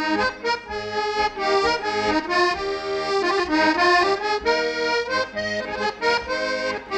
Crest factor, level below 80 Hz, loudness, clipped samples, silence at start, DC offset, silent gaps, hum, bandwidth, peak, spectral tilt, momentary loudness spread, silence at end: 14 dB; -50 dBFS; -22 LUFS; under 0.1%; 0 s; under 0.1%; none; none; 10.5 kHz; -8 dBFS; -3 dB/octave; 8 LU; 0 s